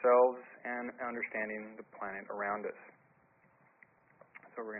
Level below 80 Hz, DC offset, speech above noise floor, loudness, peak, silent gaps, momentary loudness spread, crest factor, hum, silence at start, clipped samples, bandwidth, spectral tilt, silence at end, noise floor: -80 dBFS; under 0.1%; 28 dB; -36 LUFS; -14 dBFS; none; 20 LU; 22 dB; none; 0 s; under 0.1%; 3 kHz; 2 dB/octave; 0 s; -68 dBFS